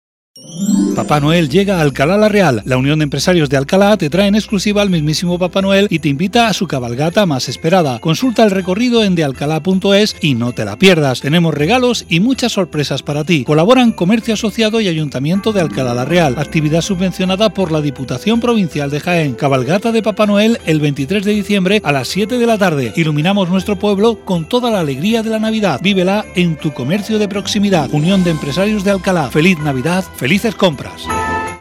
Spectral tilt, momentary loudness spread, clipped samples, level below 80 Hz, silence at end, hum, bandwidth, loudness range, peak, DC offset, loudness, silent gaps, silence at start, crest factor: -5.5 dB/octave; 5 LU; 0.2%; -40 dBFS; 0 s; none; 15.5 kHz; 2 LU; 0 dBFS; under 0.1%; -14 LUFS; none; 0.35 s; 14 dB